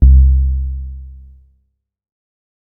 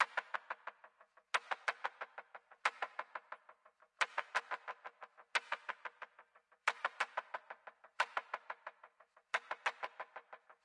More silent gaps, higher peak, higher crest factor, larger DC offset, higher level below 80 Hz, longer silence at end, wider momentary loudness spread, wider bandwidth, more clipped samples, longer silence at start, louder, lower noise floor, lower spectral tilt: neither; first, 0 dBFS vs -16 dBFS; second, 14 dB vs 28 dB; neither; first, -14 dBFS vs under -90 dBFS; first, 1.65 s vs 0.1 s; first, 24 LU vs 17 LU; second, 0.5 kHz vs 11 kHz; neither; about the same, 0 s vs 0 s; first, -14 LUFS vs -42 LUFS; second, -63 dBFS vs -69 dBFS; first, -15 dB/octave vs 1.5 dB/octave